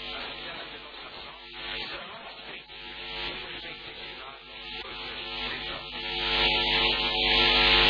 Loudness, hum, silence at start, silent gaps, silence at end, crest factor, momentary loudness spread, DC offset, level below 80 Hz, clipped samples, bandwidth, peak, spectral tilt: -26 LUFS; none; 0 s; none; 0 s; 22 dB; 20 LU; under 0.1%; -46 dBFS; under 0.1%; 5.2 kHz; -8 dBFS; -4 dB/octave